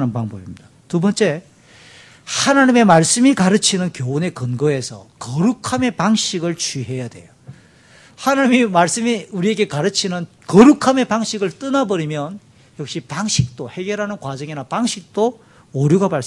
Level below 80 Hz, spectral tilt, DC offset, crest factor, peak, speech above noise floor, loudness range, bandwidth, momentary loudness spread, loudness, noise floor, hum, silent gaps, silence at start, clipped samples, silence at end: -54 dBFS; -4.5 dB/octave; under 0.1%; 18 dB; 0 dBFS; 30 dB; 7 LU; 12 kHz; 16 LU; -17 LUFS; -47 dBFS; none; none; 0 s; under 0.1%; 0 s